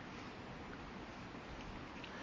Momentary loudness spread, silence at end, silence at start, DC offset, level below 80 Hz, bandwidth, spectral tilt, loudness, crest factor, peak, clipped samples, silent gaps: 1 LU; 0 s; 0 s; under 0.1%; -60 dBFS; 7.6 kHz; -5.5 dB/octave; -50 LUFS; 12 dB; -38 dBFS; under 0.1%; none